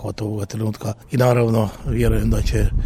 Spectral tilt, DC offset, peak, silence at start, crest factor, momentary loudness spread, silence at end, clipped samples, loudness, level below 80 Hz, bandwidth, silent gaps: -7 dB/octave; under 0.1%; -4 dBFS; 0 s; 14 dB; 9 LU; 0 s; under 0.1%; -20 LUFS; -24 dBFS; 15.5 kHz; none